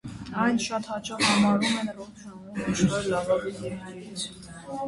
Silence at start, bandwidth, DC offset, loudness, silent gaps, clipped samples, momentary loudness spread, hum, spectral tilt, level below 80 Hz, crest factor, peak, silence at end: 0.05 s; 11.5 kHz; under 0.1%; -26 LUFS; none; under 0.1%; 17 LU; none; -4.5 dB/octave; -54 dBFS; 18 dB; -8 dBFS; 0 s